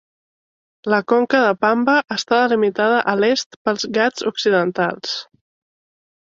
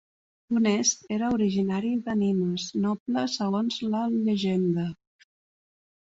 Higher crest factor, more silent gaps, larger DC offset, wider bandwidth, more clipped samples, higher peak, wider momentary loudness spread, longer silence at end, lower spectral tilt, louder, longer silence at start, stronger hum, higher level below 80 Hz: about the same, 16 dB vs 16 dB; first, 3.46-3.50 s, 3.56-3.65 s vs 3.00-3.06 s; neither; about the same, 7.6 kHz vs 7.8 kHz; neither; first, -2 dBFS vs -12 dBFS; first, 7 LU vs 4 LU; second, 0.95 s vs 1.2 s; about the same, -4 dB/octave vs -5 dB/octave; first, -18 LUFS vs -26 LUFS; first, 0.85 s vs 0.5 s; neither; about the same, -66 dBFS vs -64 dBFS